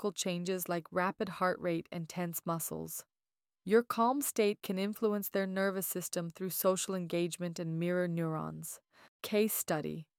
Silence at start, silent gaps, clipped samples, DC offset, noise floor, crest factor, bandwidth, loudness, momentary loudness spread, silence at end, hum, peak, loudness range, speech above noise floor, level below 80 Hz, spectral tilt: 0 s; 9.08-9.20 s; under 0.1%; under 0.1%; under -90 dBFS; 20 dB; 18 kHz; -34 LUFS; 10 LU; 0.15 s; none; -16 dBFS; 3 LU; over 56 dB; -76 dBFS; -4.5 dB/octave